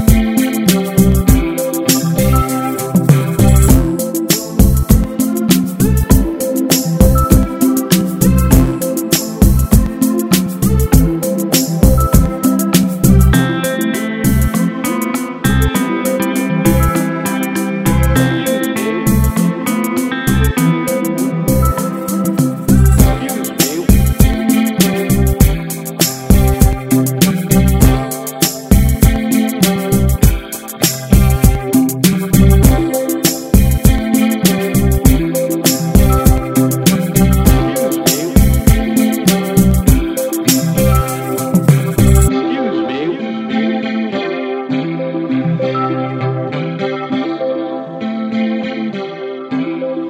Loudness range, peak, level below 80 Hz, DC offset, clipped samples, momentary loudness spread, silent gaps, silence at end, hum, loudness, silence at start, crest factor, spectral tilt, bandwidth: 5 LU; 0 dBFS; -18 dBFS; under 0.1%; 0.3%; 8 LU; none; 0 s; none; -13 LUFS; 0 s; 12 dB; -5.5 dB/octave; 16.5 kHz